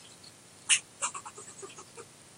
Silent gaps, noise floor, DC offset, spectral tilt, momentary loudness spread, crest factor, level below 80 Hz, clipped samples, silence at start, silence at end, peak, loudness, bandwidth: none; -54 dBFS; under 0.1%; 1.5 dB/octave; 23 LU; 28 dB; -80 dBFS; under 0.1%; 0 s; 0 s; -8 dBFS; -29 LUFS; 16 kHz